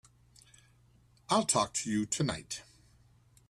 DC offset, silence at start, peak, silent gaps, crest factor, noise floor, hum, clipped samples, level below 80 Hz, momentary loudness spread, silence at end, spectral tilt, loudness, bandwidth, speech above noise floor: under 0.1%; 1.3 s; -14 dBFS; none; 22 dB; -64 dBFS; none; under 0.1%; -64 dBFS; 14 LU; 0.9 s; -3.5 dB/octave; -32 LUFS; 14 kHz; 33 dB